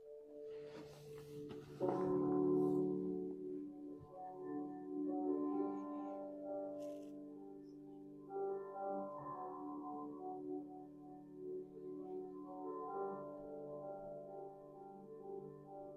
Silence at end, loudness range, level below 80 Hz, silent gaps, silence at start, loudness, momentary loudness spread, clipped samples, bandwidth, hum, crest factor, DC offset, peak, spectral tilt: 0 s; 9 LU; -80 dBFS; none; 0 s; -45 LUFS; 17 LU; under 0.1%; 8.4 kHz; none; 20 dB; under 0.1%; -26 dBFS; -9 dB/octave